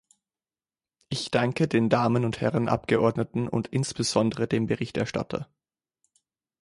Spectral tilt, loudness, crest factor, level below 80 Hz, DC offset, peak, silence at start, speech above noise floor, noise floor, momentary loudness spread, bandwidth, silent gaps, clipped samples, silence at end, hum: -6 dB/octave; -26 LUFS; 20 dB; -56 dBFS; under 0.1%; -8 dBFS; 1.1 s; over 65 dB; under -90 dBFS; 9 LU; 11.5 kHz; none; under 0.1%; 1.15 s; none